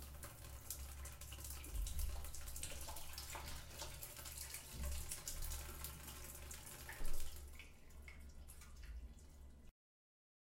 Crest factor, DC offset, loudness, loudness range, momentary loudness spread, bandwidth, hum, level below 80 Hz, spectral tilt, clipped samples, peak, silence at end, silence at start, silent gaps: 20 dB; under 0.1%; -51 LUFS; 6 LU; 12 LU; 17 kHz; none; -50 dBFS; -2.5 dB/octave; under 0.1%; -26 dBFS; 0.7 s; 0 s; none